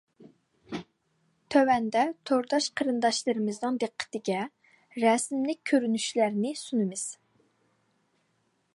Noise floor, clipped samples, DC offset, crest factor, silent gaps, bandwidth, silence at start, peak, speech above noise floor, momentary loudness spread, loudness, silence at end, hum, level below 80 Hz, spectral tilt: -73 dBFS; under 0.1%; under 0.1%; 20 dB; none; 11.5 kHz; 0.2 s; -10 dBFS; 46 dB; 12 LU; -28 LUFS; 1.6 s; none; -74 dBFS; -4 dB/octave